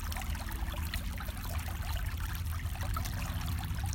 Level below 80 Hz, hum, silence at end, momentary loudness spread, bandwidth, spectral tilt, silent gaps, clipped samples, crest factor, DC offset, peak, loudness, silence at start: -38 dBFS; none; 0 s; 2 LU; 17 kHz; -4.5 dB/octave; none; under 0.1%; 14 dB; under 0.1%; -20 dBFS; -38 LUFS; 0 s